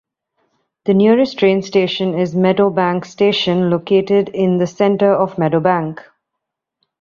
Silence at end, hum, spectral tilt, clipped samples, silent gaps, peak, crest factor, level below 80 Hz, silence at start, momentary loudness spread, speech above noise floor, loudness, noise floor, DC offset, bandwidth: 1.05 s; none; -7 dB/octave; under 0.1%; none; -2 dBFS; 14 dB; -58 dBFS; 0.85 s; 5 LU; 65 dB; -15 LUFS; -79 dBFS; under 0.1%; 7.2 kHz